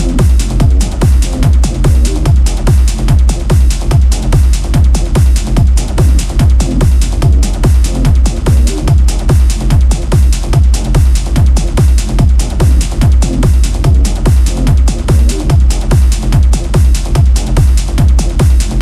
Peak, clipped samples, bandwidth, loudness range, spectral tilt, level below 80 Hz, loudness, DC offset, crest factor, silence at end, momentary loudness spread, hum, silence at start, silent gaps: 0 dBFS; under 0.1%; 13.5 kHz; 0 LU; -6 dB/octave; -8 dBFS; -11 LUFS; under 0.1%; 8 dB; 0 s; 0 LU; none; 0 s; none